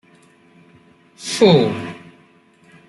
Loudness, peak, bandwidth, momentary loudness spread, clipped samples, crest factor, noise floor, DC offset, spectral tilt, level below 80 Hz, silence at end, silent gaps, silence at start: -16 LUFS; -2 dBFS; 12 kHz; 20 LU; under 0.1%; 20 dB; -52 dBFS; under 0.1%; -5.5 dB/octave; -60 dBFS; 0.9 s; none; 1.2 s